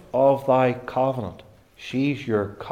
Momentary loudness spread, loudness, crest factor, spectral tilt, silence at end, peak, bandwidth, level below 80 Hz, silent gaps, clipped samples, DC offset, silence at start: 12 LU; -23 LUFS; 16 dB; -7.5 dB/octave; 0 s; -6 dBFS; 15 kHz; -58 dBFS; none; under 0.1%; under 0.1%; 0.15 s